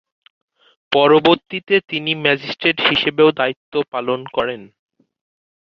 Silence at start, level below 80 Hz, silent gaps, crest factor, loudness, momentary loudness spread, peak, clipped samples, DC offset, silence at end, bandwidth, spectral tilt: 0.9 s; -58 dBFS; 3.56-3.72 s; 18 dB; -17 LUFS; 9 LU; 0 dBFS; under 0.1%; under 0.1%; 0.95 s; 6.4 kHz; -6.5 dB/octave